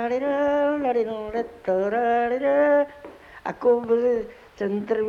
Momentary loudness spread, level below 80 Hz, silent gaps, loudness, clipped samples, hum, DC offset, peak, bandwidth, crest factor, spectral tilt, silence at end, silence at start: 12 LU; -58 dBFS; none; -23 LUFS; under 0.1%; none; under 0.1%; -8 dBFS; 6.8 kHz; 14 dB; -7 dB/octave; 0 s; 0 s